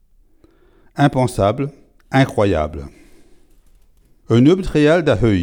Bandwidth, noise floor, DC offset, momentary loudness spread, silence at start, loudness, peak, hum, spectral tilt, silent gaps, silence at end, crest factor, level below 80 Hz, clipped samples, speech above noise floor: 17 kHz; -51 dBFS; under 0.1%; 12 LU; 0.95 s; -16 LUFS; 0 dBFS; none; -7 dB/octave; none; 0 s; 16 dB; -36 dBFS; under 0.1%; 37 dB